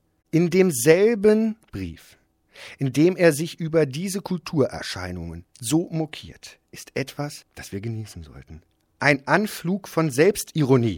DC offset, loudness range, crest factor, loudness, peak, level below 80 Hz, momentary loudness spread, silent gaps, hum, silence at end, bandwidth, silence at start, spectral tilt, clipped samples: under 0.1%; 9 LU; 22 dB; -22 LUFS; -2 dBFS; -54 dBFS; 20 LU; none; none; 0 s; 17 kHz; 0.35 s; -5.5 dB/octave; under 0.1%